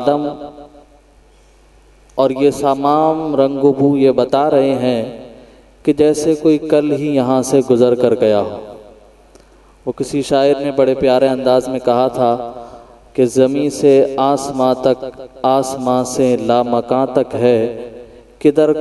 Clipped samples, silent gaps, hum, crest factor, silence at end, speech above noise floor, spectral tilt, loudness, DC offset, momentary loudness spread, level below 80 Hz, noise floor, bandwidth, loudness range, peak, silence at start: under 0.1%; none; none; 14 dB; 0 s; 34 dB; -6 dB/octave; -14 LUFS; under 0.1%; 12 LU; -48 dBFS; -47 dBFS; 12.5 kHz; 3 LU; 0 dBFS; 0 s